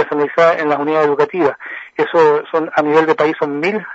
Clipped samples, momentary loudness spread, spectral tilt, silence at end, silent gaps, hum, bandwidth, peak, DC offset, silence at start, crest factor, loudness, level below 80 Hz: under 0.1%; 6 LU; -6.5 dB/octave; 0 s; none; none; 7.8 kHz; 0 dBFS; under 0.1%; 0 s; 14 dB; -15 LUFS; -66 dBFS